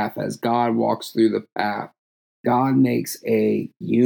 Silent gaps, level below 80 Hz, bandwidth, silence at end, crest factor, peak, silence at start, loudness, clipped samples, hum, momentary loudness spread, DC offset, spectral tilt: 1.99-2.44 s; -80 dBFS; over 20 kHz; 0 s; 16 dB; -6 dBFS; 0 s; -22 LUFS; under 0.1%; none; 7 LU; under 0.1%; -6.5 dB/octave